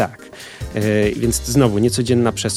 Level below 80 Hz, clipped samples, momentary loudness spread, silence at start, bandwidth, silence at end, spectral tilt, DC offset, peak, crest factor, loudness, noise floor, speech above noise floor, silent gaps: -36 dBFS; under 0.1%; 16 LU; 0 s; 16 kHz; 0 s; -5 dB/octave; under 0.1%; -2 dBFS; 16 dB; -17 LUFS; -37 dBFS; 21 dB; none